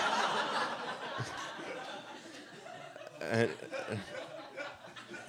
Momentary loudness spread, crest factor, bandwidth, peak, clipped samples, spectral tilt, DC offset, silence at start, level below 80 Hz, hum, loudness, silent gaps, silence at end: 16 LU; 22 dB; 16.5 kHz; -16 dBFS; under 0.1%; -4 dB/octave; under 0.1%; 0 s; -78 dBFS; none; -38 LUFS; none; 0 s